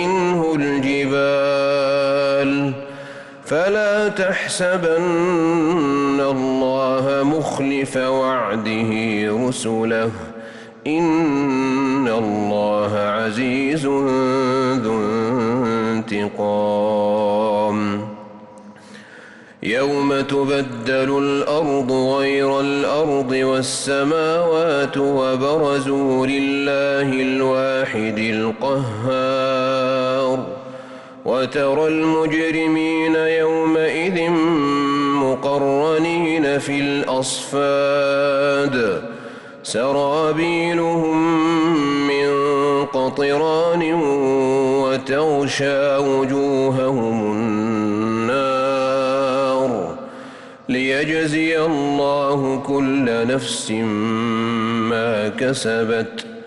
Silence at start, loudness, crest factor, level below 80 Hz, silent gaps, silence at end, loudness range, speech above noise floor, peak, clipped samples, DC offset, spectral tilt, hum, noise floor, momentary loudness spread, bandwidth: 0 s; -19 LUFS; 8 dB; -56 dBFS; none; 0 s; 3 LU; 24 dB; -10 dBFS; under 0.1%; under 0.1%; -5.5 dB/octave; none; -42 dBFS; 4 LU; 11.5 kHz